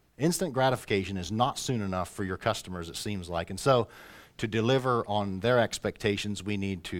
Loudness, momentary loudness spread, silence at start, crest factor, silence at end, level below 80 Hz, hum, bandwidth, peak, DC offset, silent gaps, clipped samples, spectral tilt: -29 LUFS; 9 LU; 0.2 s; 20 dB; 0 s; -56 dBFS; none; 17.5 kHz; -10 dBFS; under 0.1%; none; under 0.1%; -5 dB/octave